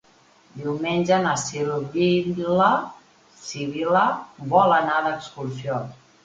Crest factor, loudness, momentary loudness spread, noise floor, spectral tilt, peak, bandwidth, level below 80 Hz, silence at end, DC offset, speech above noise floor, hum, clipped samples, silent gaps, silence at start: 20 dB; -22 LUFS; 13 LU; -56 dBFS; -5 dB/octave; -4 dBFS; 9.4 kHz; -60 dBFS; 0.3 s; under 0.1%; 34 dB; none; under 0.1%; none; 0.55 s